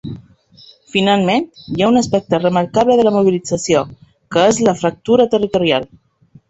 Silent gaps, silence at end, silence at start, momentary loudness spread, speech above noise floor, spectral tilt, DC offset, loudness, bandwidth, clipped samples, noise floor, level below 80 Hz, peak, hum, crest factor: none; 0.65 s; 0.05 s; 8 LU; 32 dB; -5 dB/octave; under 0.1%; -15 LUFS; 8.2 kHz; under 0.1%; -46 dBFS; -50 dBFS; 0 dBFS; none; 14 dB